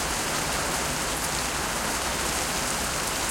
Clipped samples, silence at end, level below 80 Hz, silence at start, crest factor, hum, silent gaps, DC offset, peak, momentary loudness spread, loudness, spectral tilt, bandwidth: under 0.1%; 0 s; -42 dBFS; 0 s; 14 dB; none; none; under 0.1%; -12 dBFS; 1 LU; -26 LUFS; -2 dB/octave; 16.5 kHz